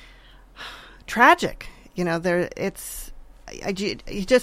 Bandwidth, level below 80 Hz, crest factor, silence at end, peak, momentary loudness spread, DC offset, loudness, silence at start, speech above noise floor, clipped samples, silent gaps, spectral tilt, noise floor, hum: 16.5 kHz; -44 dBFS; 22 dB; 0 s; -2 dBFS; 24 LU; under 0.1%; -22 LUFS; 0 s; 27 dB; under 0.1%; none; -4.5 dB/octave; -49 dBFS; none